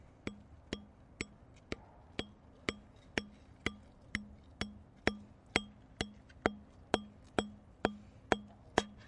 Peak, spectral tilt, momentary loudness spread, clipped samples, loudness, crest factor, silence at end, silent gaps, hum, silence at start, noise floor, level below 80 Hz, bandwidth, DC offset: -8 dBFS; -4 dB/octave; 17 LU; under 0.1%; -41 LUFS; 34 dB; 0 s; none; none; 0.25 s; -58 dBFS; -58 dBFS; 11 kHz; under 0.1%